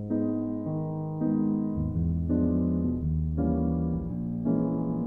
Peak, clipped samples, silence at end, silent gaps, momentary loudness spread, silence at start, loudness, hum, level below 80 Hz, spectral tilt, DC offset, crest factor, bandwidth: -14 dBFS; under 0.1%; 0 s; none; 5 LU; 0 s; -28 LUFS; none; -38 dBFS; -13.5 dB/octave; 0.1%; 14 dB; 2 kHz